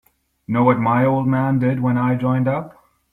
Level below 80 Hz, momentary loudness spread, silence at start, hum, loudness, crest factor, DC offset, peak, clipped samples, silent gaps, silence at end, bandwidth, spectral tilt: -54 dBFS; 7 LU; 0.5 s; none; -18 LUFS; 16 dB; under 0.1%; -4 dBFS; under 0.1%; none; 0.45 s; 3.9 kHz; -10.5 dB/octave